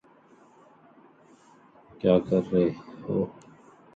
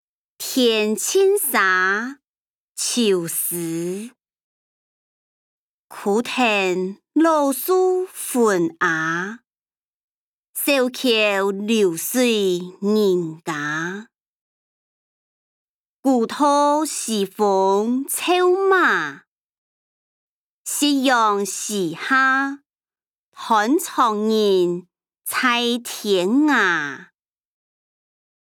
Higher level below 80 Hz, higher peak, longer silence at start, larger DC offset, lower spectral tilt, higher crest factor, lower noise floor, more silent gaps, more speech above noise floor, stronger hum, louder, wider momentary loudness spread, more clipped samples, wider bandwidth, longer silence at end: first, -60 dBFS vs -78 dBFS; second, -8 dBFS vs -4 dBFS; first, 2.05 s vs 0.4 s; neither; first, -9 dB/octave vs -3 dB/octave; first, 22 dB vs 16 dB; second, -57 dBFS vs under -90 dBFS; second, none vs 2.27-2.75 s, 4.43-5.88 s, 9.61-9.65 s, 9.77-10.54 s, 14.15-16.03 s, 19.27-20.65 s, 22.66-22.79 s, 23.19-23.32 s; second, 33 dB vs over 71 dB; neither; second, -26 LUFS vs -19 LUFS; about the same, 10 LU vs 10 LU; neither; second, 7.6 kHz vs 20 kHz; second, 0.65 s vs 1.5 s